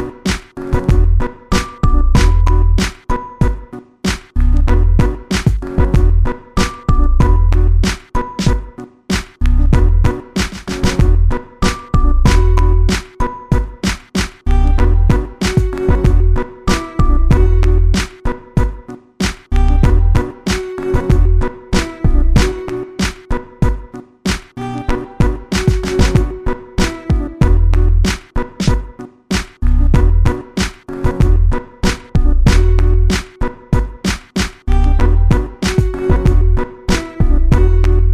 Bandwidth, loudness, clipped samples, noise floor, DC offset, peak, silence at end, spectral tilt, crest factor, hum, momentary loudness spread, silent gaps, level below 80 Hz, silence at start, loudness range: 12 kHz; -16 LUFS; under 0.1%; -31 dBFS; under 0.1%; 0 dBFS; 0 s; -6 dB/octave; 12 dB; none; 9 LU; none; -14 dBFS; 0 s; 2 LU